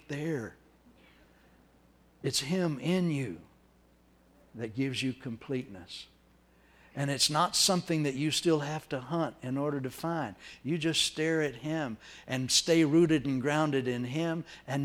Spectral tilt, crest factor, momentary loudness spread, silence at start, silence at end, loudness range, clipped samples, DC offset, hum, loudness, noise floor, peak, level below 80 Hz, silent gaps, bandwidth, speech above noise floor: -4 dB/octave; 20 dB; 15 LU; 0.1 s; 0 s; 9 LU; under 0.1%; under 0.1%; none; -30 LUFS; -63 dBFS; -12 dBFS; -64 dBFS; none; 16.5 kHz; 33 dB